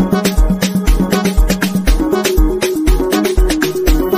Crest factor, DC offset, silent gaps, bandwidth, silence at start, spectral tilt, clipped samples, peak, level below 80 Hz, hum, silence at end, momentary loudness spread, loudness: 12 dB; under 0.1%; none; 15.5 kHz; 0 s; -5.5 dB/octave; under 0.1%; 0 dBFS; -16 dBFS; none; 0 s; 1 LU; -14 LUFS